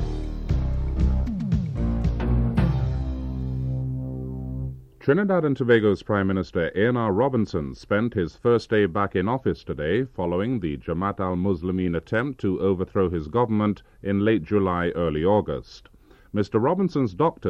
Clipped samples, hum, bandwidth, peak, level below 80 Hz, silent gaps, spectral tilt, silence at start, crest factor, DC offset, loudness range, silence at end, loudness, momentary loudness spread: under 0.1%; none; 7.4 kHz; -6 dBFS; -34 dBFS; none; -9 dB/octave; 0 s; 18 dB; under 0.1%; 3 LU; 0 s; -24 LUFS; 9 LU